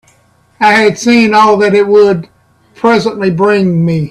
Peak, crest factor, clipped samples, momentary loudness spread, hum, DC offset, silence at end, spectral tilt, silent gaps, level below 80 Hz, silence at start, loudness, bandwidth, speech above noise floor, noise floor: 0 dBFS; 10 dB; under 0.1%; 5 LU; none; under 0.1%; 0 s; -6 dB/octave; none; -50 dBFS; 0.6 s; -9 LUFS; 12 kHz; 41 dB; -50 dBFS